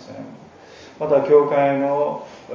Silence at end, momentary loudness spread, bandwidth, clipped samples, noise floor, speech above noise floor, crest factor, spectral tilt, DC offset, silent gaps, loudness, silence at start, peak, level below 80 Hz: 0 s; 22 LU; 7.2 kHz; under 0.1%; -43 dBFS; 26 dB; 18 dB; -7.5 dB/octave; under 0.1%; none; -18 LUFS; 0 s; -2 dBFS; -64 dBFS